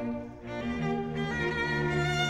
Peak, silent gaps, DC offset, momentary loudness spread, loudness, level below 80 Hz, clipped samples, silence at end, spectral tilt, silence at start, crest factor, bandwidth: -18 dBFS; none; under 0.1%; 9 LU; -31 LUFS; -48 dBFS; under 0.1%; 0 s; -5.5 dB/octave; 0 s; 14 dB; 12 kHz